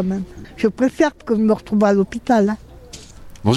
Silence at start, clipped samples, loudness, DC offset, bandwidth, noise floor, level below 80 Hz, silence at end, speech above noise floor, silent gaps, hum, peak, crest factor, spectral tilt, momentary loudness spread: 0 s; under 0.1%; -18 LUFS; under 0.1%; 12 kHz; -39 dBFS; -44 dBFS; 0 s; 21 dB; none; none; -4 dBFS; 14 dB; -7 dB/octave; 22 LU